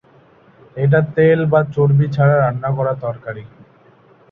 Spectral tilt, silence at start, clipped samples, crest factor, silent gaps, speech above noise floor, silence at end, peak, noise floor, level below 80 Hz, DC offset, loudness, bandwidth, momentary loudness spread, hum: -10.5 dB/octave; 0.75 s; under 0.1%; 14 dB; none; 34 dB; 0.85 s; -2 dBFS; -49 dBFS; -52 dBFS; under 0.1%; -16 LUFS; 4.7 kHz; 16 LU; none